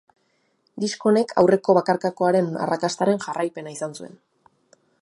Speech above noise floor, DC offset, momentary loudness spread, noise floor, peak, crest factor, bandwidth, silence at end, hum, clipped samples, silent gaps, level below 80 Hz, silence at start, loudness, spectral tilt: 47 dB; under 0.1%; 14 LU; -68 dBFS; -2 dBFS; 20 dB; 11.5 kHz; 0.95 s; none; under 0.1%; none; -68 dBFS; 0.75 s; -22 LUFS; -5.5 dB/octave